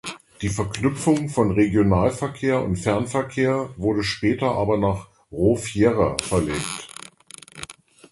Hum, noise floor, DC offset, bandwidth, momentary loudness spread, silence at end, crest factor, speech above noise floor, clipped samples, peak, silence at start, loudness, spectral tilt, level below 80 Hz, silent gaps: none; -46 dBFS; under 0.1%; 12 kHz; 18 LU; 0.4 s; 22 dB; 24 dB; under 0.1%; 0 dBFS; 0.05 s; -22 LUFS; -6 dB/octave; -42 dBFS; none